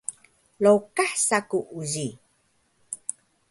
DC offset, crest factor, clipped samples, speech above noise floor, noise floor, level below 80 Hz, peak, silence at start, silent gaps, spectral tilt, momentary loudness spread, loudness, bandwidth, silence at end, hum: under 0.1%; 20 dB; under 0.1%; 44 dB; -67 dBFS; -70 dBFS; -6 dBFS; 0.1 s; none; -3.5 dB/octave; 15 LU; -25 LUFS; 11.5 kHz; 0.55 s; none